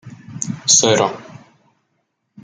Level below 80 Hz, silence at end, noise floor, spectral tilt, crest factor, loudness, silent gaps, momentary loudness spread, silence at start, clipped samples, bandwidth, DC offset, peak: -62 dBFS; 1.05 s; -70 dBFS; -2 dB/octave; 20 dB; -15 LUFS; none; 23 LU; 0.05 s; under 0.1%; 11 kHz; under 0.1%; 0 dBFS